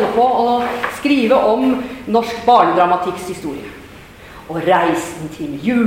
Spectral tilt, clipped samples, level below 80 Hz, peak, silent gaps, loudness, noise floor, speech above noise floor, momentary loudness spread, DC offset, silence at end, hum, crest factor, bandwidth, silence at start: -5.5 dB/octave; under 0.1%; -48 dBFS; 0 dBFS; none; -16 LUFS; -38 dBFS; 22 dB; 15 LU; under 0.1%; 0 s; none; 16 dB; 16.5 kHz; 0 s